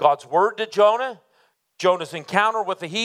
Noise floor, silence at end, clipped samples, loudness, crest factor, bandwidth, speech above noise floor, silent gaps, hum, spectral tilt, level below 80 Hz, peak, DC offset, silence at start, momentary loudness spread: -64 dBFS; 0 s; under 0.1%; -21 LUFS; 20 dB; 13.5 kHz; 43 dB; none; none; -4 dB/octave; -80 dBFS; -2 dBFS; under 0.1%; 0 s; 7 LU